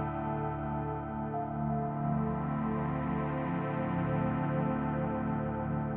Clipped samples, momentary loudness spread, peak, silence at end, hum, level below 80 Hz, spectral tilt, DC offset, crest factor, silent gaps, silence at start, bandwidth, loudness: under 0.1%; 4 LU; -20 dBFS; 0 s; none; -50 dBFS; -8.5 dB/octave; under 0.1%; 12 dB; none; 0 s; 3.7 kHz; -34 LUFS